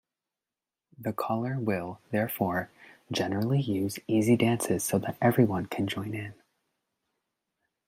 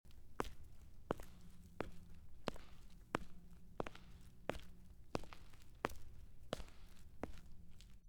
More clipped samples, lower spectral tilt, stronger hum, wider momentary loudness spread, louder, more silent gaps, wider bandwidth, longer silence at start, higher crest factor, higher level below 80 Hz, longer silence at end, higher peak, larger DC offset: neither; about the same, -6 dB/octave vs -5 dB/octave; neither; second, 11 LU vs 16 LU; first, -29 LUFS vs -51 LUFS; neither; second, 16 kHz vs 19 kHz; first, 1 s vs 0.05 s; second, 20 dB vs 32 dB; second, -68 dBFS vs -58 dBFS; first, 1.55 s vs 0 s; first, -10 dBFS vs -16 dBFS; neither